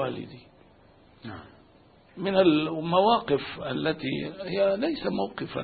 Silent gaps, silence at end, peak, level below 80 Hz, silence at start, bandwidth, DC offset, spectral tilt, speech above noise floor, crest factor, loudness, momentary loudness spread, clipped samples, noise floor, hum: none; 0 s; -8 dBFS; -60 dBFS; 0 s; 4.8 kHz; under 0.1%; -10 dB/octave; 30 dB; 20 dB; -26 LUFS; 21 LU; under 0.1%; -57 dBFS; none